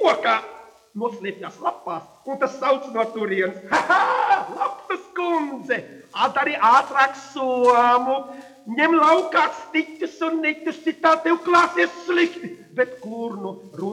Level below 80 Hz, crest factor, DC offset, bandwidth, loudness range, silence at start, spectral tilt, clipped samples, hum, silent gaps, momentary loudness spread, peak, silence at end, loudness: -70 dBFS; 18 dB; under 0.1%; 11.5 kHz; 5 LU; 0 s; -4 dB/octave; under 0.1%; none; none; 15 LU; -2 dBFS; 0 s; -21 LUFS